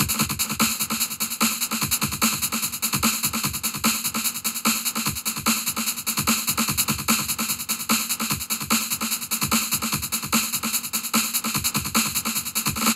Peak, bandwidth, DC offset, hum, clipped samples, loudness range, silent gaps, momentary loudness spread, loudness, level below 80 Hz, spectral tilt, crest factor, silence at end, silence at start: -4 dBFS; 16.5 kHz; under 0.1%; none; under 0.1%; 1 LU; none; 3 LU; -22 LUFS; -50 dBFS; -1.5 dB/octave; 20 dB; 0 s; 0 s